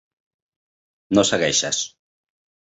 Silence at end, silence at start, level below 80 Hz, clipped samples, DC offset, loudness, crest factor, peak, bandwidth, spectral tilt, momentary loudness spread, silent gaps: 0.8 s; 1.1 s; -58 dBFS; under 0.1%; under 0.1%; -19 LUFS; 22 dB; -2 dBFS; 8.2 kHz; -2.5 dB/octave; 7 LU; none